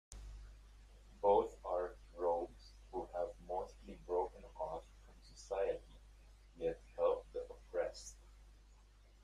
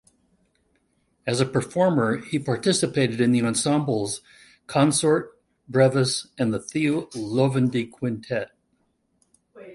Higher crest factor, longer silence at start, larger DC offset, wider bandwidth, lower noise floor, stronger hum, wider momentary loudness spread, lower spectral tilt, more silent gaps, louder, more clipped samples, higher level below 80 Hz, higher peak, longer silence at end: about the same, 22 dB vs 20 dB; second, 0.1 s vs 1.25 s; neither; about the same, 11.5 kHz vs 11.5 kHz; second, -64 dBFS vs -70 dBFS; neither; first, 19 LU vs 10 LU; about the same, -5 dB/octave vs -5 dB/octave; neither; second, -41 LUFS vs -23 LUFS; neither; about the same, -58 dBFS vs -62 dBFS; second, -20 dBFS vs -4 dBFS; about the same, 0.1 s vs 0 s